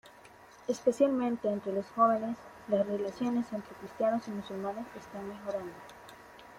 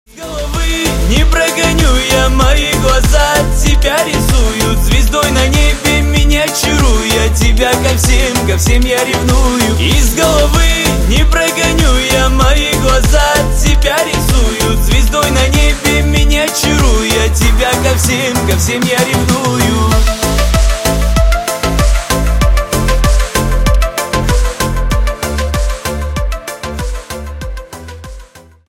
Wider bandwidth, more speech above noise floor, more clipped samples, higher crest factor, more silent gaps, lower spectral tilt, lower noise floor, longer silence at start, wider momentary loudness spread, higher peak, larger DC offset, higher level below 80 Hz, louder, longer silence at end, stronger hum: about the same, 16 kHz vs 16.5 kHz; second, 23 dB vs 27 dB; neither; first, 20 dB vs 10 dB; neither; first, -6.5 dB/octave vs -4 dB/octave; first, -55 dBFS vs -36 dBFS; about the same, 0.05 s vs 0.15 s; first, 18 LU vs 7 LU; second, -12 dBFS vs 0 dBFS; neither; second, -70 dBFS vs -12 dBFS; second, -32 LUFS vs -11 LUFS; second, 0 s vs 0.3 s; neither